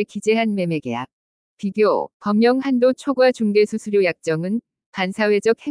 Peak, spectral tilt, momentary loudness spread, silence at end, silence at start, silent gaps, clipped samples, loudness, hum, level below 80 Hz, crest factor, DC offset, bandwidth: -6 dBFS; -6 dB/octave; 11 LU; 0 s; 0 s; 1.13-1.57 s, 2.14-2.20 s, 4.86-4.93 s; under 0.1%; -20 LUFS; none; -68 dBFS; 14 dB; under 0.1%; 10.5 kHz